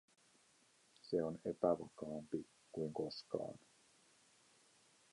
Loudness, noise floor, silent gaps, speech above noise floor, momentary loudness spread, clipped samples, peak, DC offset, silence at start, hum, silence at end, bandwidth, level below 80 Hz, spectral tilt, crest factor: -43 LUFS; -73 dBFS; none; 31 dB; 13 LU; under 0.1%; -22 dBFS; under 0.1%; 1.05 s; none; 1.55 s; 11.5 kHz; -78 dBFS; -6.5 dB/octave; 24 dB